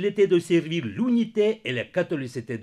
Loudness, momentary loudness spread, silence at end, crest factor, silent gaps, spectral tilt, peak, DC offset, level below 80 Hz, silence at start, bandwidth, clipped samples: -24 LUFS; 8 LU; 0 s; 14 dB; none; -6.5 dB/octave; -10 dBFS; under 0.1%; -70 dBFS; 0 s; 12 kHz; under 0.1%